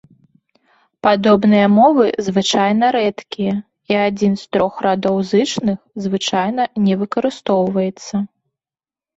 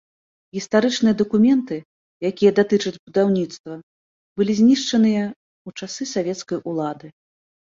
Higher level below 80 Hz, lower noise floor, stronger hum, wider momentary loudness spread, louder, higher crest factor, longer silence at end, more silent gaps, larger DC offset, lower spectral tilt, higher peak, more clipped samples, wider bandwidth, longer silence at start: first, -56 dBFS vs -62 dBFS; about the same, under -90 dBFS vs under -90 dBFS; neither; second, 10 LU vs 19 LU; first, -16 LUFS vs -20 LUFS; about the same, 16 dB vs 18 dB; first, 0.9 s vs 0.65 s; second, none vs 1.85-2.20 s, 2.99-3.07 s, 3.59-3.64 s, 3.83-4.36 s, 5.36-5.65 s; neither; about the same, -5.5 dB/octave vs -5.5 dB/octave; about the same, -2 dBFS vs -4 dBFS; neither; about the same, 8 kHz vs 7.6 kHz; first, 1.05 s vs 0.55 s